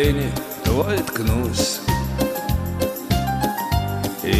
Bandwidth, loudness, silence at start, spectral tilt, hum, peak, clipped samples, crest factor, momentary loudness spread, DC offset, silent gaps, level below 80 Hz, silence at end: 16 kHz; -22 LUFS; 0 s; -5 dB/octave; none; -4 dBFS; under 0.1%; 16 dB; 4 LU; under 0.1%; none; -30 dBFS; 0 s